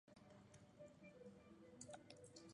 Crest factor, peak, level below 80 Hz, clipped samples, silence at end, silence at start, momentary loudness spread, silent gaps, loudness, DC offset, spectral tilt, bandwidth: 20 dB; -42 dBFS; -84 dBFS; under 0.1%; 0 s; 0.05 s; 7 LU; none; -63 LUFS; under 0.1%; -4 dB/octave; 11 kHz